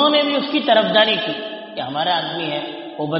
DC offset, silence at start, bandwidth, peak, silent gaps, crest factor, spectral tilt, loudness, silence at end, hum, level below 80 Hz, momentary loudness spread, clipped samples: under 0.1%; 0 s; 5.8 kHz; -2 dBFS; none; 18 dB; -1.5 dB/octave; -18 LUFS; 0 s; none; -68 dBFS; 13 LU; under 0.1%